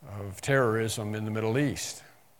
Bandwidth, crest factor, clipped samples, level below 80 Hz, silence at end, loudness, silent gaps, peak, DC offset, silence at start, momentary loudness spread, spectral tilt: 18 kHz; 20 dB; under 0.1%; -62 dBFS; 0.35 s; -29 LUFS; none; -10 dBFS; under 0.1%; 0 s; 12 LU; -5 dB/octave